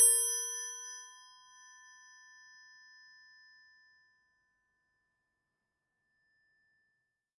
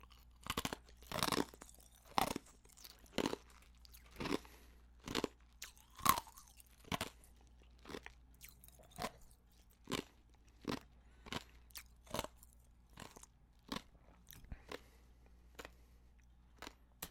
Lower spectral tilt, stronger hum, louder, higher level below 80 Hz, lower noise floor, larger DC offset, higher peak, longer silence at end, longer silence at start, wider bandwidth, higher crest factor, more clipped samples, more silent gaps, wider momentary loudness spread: second, 5.5 dB/octave vs -3 dB/octave; second, none vs 60 Hz at -75 dBFS; first, -30 LUFS vs -44 LUFS; second, under -90 dBFS vs -62 dBFS; first, -86 dBFS vs -67 dBFS; neither; about the same, -12 dBFS vs -10 dBFS; first, 6.35 s vs 0 s; about the same, 0 s vs 0 s; second, 11.5 kHz vs 16.5 kHz; second, 26 dB vs 36 dB; neither; neither; first, 29 LU vs 24 LU